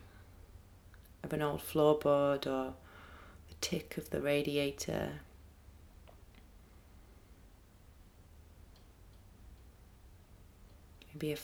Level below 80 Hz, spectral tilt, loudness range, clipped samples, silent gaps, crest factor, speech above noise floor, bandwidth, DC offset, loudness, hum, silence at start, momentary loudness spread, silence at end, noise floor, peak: -58 dBFS; -5 dB/octave; 13 LU; under 0.1%; none; 24 dB; 26 dB; over 20 kHz; under 0.1%; -35 LUFS; none; 0 s; 29 LU; 0 s; -60 dBFS; -16 dBFS